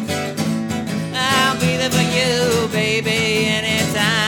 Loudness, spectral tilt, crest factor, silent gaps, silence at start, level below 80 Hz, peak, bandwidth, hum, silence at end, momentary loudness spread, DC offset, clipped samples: -17 LUFS; -4 dB/octave; 18 dB; none; 0 s; -48 dBFS; 0 dBFS; 19 kHz; none; 0 s; 7 LU; under 0.1%; under 0.1%